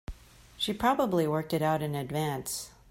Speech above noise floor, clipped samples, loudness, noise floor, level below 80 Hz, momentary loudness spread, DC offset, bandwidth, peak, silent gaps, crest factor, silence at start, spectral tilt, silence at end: 21 dB; under 0.1%; -30 LUFS; -50 dBFS; -52 dBFS; 9 LU; under 0.1%; 16.5 kHz; -12 dBFS; none; 18 dB; 0.1 s; -5 dB/octave; 0.2 s